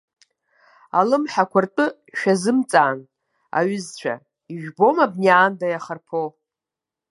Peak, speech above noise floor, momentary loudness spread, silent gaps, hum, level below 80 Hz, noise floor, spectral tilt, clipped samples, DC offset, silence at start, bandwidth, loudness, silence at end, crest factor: 0 dBFS; 68 dB; 15 LU; none; none; -76 dBFS; -88 dBFS; -5.5 dB/octave; under 0.1%; under 0.1%; 0.95 s; 11.5 kHz; -20 LUFS; 0.8 s; 20 dB